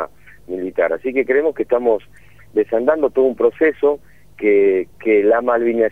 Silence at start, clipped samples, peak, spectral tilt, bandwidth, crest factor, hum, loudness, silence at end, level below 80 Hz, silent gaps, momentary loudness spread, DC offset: 0 s; under 0.1%; -2 dBFS; -7.5 dB/octave; 3.7 kHz; 16 dB; none; -17 LUFS; 0 s; -54 dBFS; none; 9 LU; 0.6%